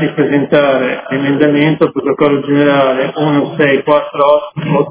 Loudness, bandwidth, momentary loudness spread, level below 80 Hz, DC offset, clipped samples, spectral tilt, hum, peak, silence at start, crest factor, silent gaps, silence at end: -12 LUFS; 4 kHz; 4 LU; -54 dBFS; under 0.1%; 0.3%; -10.5 dB/octave; none; 0 dBFS; 0 s; 12 dB; none; 0 s